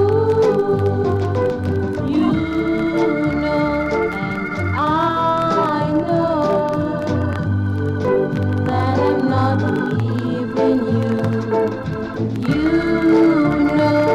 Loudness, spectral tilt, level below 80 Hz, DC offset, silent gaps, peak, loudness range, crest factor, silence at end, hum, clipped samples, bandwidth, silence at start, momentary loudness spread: -18 LUFS; -8.5 dB/octave; -42 dBFS; under 0.1%; none; -4 dBFS; 2 LU; 14 dB; 0 s; none; under 0.1%; 10 kHz; 0 s; 6 LU